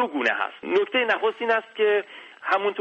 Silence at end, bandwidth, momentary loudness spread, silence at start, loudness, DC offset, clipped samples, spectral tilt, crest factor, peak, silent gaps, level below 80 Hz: 0 s; 8.2 kHz; 5 LU; 0 s; -23 LUFS; under 0.1%; under 0.1%; -4 dB/octave; 16 dB; -8 dBFS; none; -76 dBFS